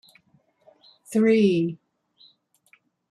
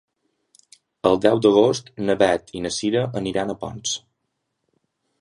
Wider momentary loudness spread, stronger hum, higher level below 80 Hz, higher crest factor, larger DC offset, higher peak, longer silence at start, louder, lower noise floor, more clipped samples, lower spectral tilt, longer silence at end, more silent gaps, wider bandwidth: about the same, 13 LU vs 11 LU; neither; second, -72 dBFS vs -54 dBFS; about the same, 18 dB vs 20 dB; neither; second, -10 dBFS vs -2 dBFS; about the same, 1.1 s vs 1.05 s; about the same, -22 LUFS vs -21 LUFS; second, -64 dBFS vs -76 dBFS; neither; first, -7 dB/octave vs -4.5 dB/octave; about the same, 1.35 s vs 1.25 s; neither; about the same, 12.5 kHz vs 11.5 kHz